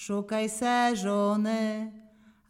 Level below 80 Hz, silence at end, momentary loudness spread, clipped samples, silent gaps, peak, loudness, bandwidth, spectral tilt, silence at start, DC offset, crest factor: -70 dBFS; 0.5 s; 8 LU; under 0.1%; none; -14 dBFS; -28 LUFS; 15 kHz; -4.5 dB/octave; 0 s; under 0.1%; 16 dB